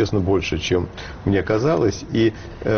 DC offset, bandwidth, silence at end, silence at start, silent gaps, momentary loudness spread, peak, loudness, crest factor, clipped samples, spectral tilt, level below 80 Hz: under 0.1%; 6.8 kHz; 0 s; 0 s; none; 7 LU; -6 dBFS; -21 LUFS; 14 dB; under 0.1%; -5.5 dB/octave; -38 dBFS